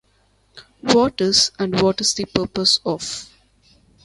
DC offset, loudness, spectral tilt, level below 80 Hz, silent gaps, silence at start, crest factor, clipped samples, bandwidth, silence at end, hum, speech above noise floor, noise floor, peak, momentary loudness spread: under 0.1%; -18 LUFS; -3 dB/octave; -50 dBFS; none; 0.55 s; 20 dB; under 0.1%; 11.5 kHz; 0.8 s; none; 41 dB; -60 dBFS; 0 dBFS; 11 LU